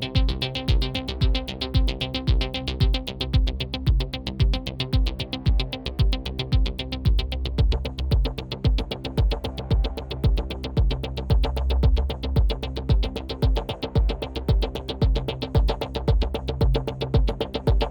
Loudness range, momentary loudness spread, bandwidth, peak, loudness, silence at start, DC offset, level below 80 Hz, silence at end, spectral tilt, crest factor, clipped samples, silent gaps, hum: 1 LU; 4 LU; 17.5 kHz; -8 dBFS; -25 LUFS; 0 s; under 0.1%; -24 dBFS; 0 s; -7 dB/octave; 16 dB; under 0.1%; none; none